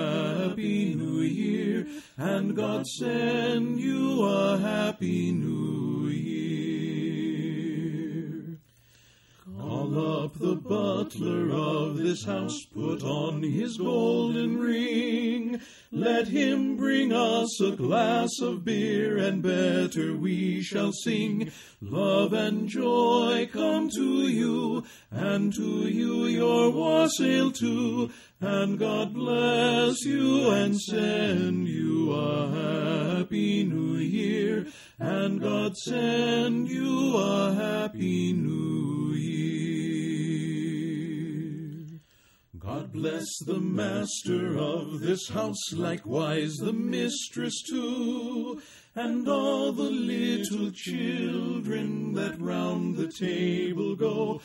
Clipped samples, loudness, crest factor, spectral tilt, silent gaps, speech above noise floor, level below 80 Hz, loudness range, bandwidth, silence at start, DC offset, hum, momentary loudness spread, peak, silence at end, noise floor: under 0.1%; -28 LUFS; 16 dB; -5.5 dB/octave; none; 36 dB; -66 dBFS; 6 LU; 16 kHz; 0 s; under 0.1%; none; 8 LU; -10 dBFS; 0 s; -62 dBFS